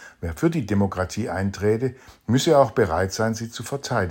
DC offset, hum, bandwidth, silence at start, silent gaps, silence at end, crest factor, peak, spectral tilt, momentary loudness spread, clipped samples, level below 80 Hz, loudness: under 0.1%; none; 16.5 kHz; 0 s; none; 0 s; 20 dB; -4 dBFS; -6 dB/octave; 12 LU; under 0.1%; -50 dBFS; -23 LUFS